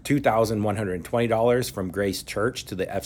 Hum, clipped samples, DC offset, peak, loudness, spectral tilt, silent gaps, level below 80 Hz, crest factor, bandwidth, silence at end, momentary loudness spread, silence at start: none; under 0.1%; under 0.1%; -8 dBFS; -25 LUFS; -5.5 dB/octave; none; -50 dBFS; 16 dB; 18 kHz; 0 s; 8 LU; 0.05 s